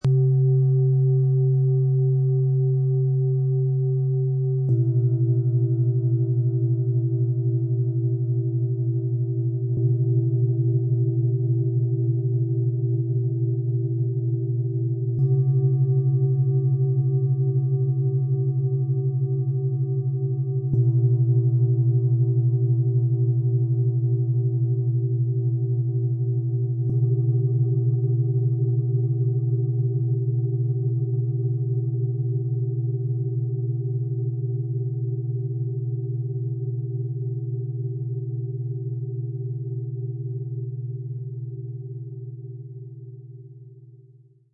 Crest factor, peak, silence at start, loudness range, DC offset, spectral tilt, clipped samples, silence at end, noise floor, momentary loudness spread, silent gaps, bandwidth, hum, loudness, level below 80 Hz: 12 dB; -12 dBFS; 0.05 s; 8 LU; under 0.1%; -14 dB/octave; under 0.1%; 0.55 s; -53 dBFS; 9 LU; none; 0.8 kHz; none; -23 LUFS; -62 dBFS